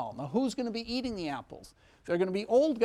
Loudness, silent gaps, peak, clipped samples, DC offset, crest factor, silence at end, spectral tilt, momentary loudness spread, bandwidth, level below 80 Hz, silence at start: -32 LUFS; none; -14 dBFS; under 0.1%; under 0.1%; 16 dB; 0 s; -6 dB/octave; 20 LU; 13 kHz; -60 dBFS; 0 s